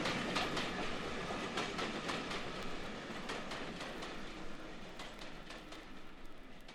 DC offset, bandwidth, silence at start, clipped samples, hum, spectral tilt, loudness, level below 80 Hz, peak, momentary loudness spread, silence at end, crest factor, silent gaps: under 0.1%; 14 kHz; 0 s; under 0.1%; none; -3.5 dB/octave; -42 LUFS; -54 dBFS; -22 dBFS; 15 LU; 0 s; 20 dB; none